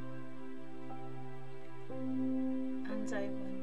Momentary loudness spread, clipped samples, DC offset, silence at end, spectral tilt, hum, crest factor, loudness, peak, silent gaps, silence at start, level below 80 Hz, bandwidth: 13 LU; under 0.1%; 1%; 0 s; -7 dB/octave; none; 14 dB; -41 LUFS; -24 dBFS; none; 0 s; -74 dBFS; 9 kHz